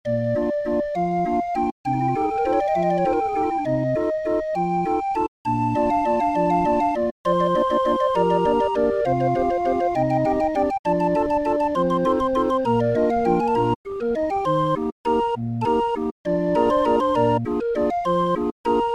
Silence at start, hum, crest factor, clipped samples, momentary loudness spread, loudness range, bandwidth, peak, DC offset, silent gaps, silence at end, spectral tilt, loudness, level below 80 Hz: 0.05 s; none; 16 dB; under 0.1%; 5 LU; 2 LU; 11.5 kHz; -6 dBFS; under 0.1%; 1.72-1.84 s, 5.28-5.45 s, 7.11-7.24 s, 10.79-10.84 s, 13.76-13.84 s, 14.92-15.04 s, 16.11-16.24 s, 18.52-18.64 s; 0 s; -8 dB/octave; -21 LUFS; -46 dBFS